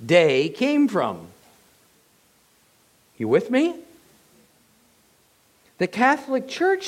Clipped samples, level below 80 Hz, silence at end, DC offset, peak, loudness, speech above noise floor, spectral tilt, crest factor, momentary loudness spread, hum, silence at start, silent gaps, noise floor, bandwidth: under 0.1%; -72 dBFS; 0 s; under 0.1%; -4 dBFS; -21 LUFS; 40 dB; -5.5 dB/octave; 20 dB; 10 LU; none; 0 s; none; -60 dBFS; 15.5 kHz